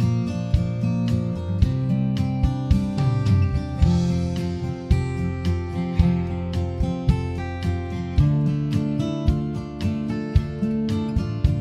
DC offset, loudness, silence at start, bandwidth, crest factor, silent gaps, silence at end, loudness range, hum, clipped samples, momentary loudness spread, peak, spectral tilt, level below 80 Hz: under 0.1%; -23 LUFS; 0 s; 10.5 kHz; 18 dB; none; 0 s; 2 LU; none; under 0.1%; 6 LU; -4 dBFS; -8.5 dB/octave; -30 dBFS